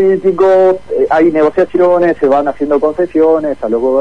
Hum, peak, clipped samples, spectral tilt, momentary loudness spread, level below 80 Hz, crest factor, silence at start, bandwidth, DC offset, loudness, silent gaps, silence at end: none; 0 dBFS; under 0.1%; -8 dB/octave; 5 LU; -44 dBFS; 10 dB; 0 s; 7.2 kHz; 2%; -11 LUFS; none; 0 s